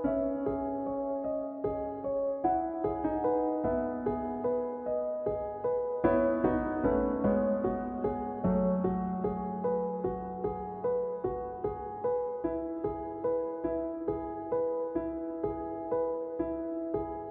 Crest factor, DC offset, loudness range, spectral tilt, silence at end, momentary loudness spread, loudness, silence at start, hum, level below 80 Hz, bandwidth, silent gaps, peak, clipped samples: 18 dB; under 0.1%; 4 LU; -9.5 dB/octave; 0 s; 7 LU; -32 LUFS; 0 s; none; -52 dBFS; 3.7 kHz; none; -14 dBFS; under 0.1%